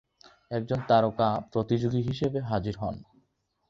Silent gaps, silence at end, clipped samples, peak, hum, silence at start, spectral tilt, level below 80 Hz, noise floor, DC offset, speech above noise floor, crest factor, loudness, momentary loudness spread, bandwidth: none; 0.65 s; under 0.1%; -8 dBFS; none; 0.5 s; -8 dB/octave; -54 dBFS; -73 dBFS; under 0.1%; 46 dB; 20 dB; -28 LUFS; 12 LU; 7.4 kHz